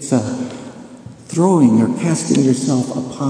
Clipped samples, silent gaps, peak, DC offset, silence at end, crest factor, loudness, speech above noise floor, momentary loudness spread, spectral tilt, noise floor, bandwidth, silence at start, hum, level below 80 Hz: under 0.1%; none; 0 dBFS; under 0.1%; 0 s; 16 dB; -16 LUFS; 22 dB; 18 LU; -6.5 dB/octave; -36 dBFS; 10.5 kHz; 0 s; none; -58 dBFS